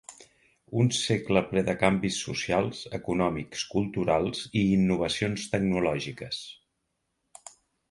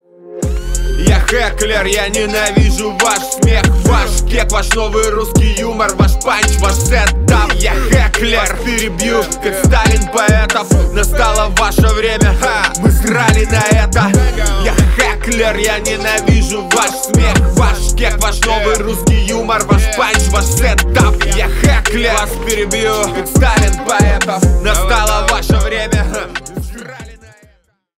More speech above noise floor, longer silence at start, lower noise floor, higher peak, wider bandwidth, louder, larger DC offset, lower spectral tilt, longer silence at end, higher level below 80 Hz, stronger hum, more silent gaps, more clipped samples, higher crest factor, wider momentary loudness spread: first, 52 dB vs 41 dB; second, 0.1 s vs 0.25 s; first, -79 dBFS vs -52 dBFS; second, -6 dBFS vs 0 dBFS; second, 11.5 kHz vs 16.5 kHz; second, -27 LUFS vs -12 LUFS; neither; about the same, -5 dB/octave vs -4 dB/octave; first, 1.35 s vs 0.85 s; second, -54 dBFS vs -16 dBFS; neither; neither; neither; first, 22 dB vs 12 dB; first, 11 LU vs 4 LU